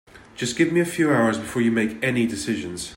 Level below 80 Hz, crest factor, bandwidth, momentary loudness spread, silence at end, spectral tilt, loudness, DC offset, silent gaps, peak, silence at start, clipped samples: -56 dBFS; 16 dB; 16.5 kHz; 8 LU; 0 s; -5 dB/octave; -22 LUFS; under 0.1%; none; -8 dBFS; 0.15 s; under 0.1%